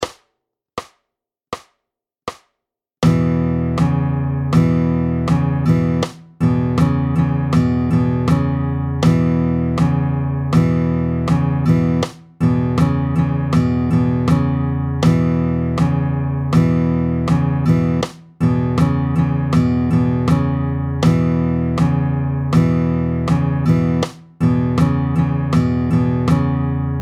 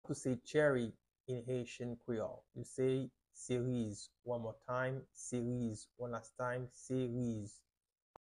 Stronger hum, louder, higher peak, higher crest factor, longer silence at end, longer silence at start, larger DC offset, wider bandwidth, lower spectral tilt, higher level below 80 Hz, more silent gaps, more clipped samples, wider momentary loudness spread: neither; first, -17 LUFS vs -41 LUFS; first, -2 dBFS vs -20 dBFS; second, 14 dB vs 20 dB; second, 0 s vs 0.65 s; about the same, 0 s vs 0.05 s; neither; second, 10 kHz vs 11.5 kHz; first, -8.5 dB/octave vs -6 dB/octave; first, -34 dBFS vs -70 dBFS; second, none vs 1.20-1.24 s; neither; second, 5 LU vs 11 LU